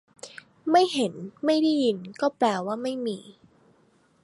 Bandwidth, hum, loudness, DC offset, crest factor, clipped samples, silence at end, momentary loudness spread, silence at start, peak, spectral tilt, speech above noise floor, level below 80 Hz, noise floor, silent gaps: 11.5 kHz; none; -25 LUFS; under 0.1%; 18 dB; under 0.1%; 0.9 s; 17 LU; 0.25 s; -8 dBFS; -5 dB/octave; 38 dB; -76 dBFS; -63 dBFS; none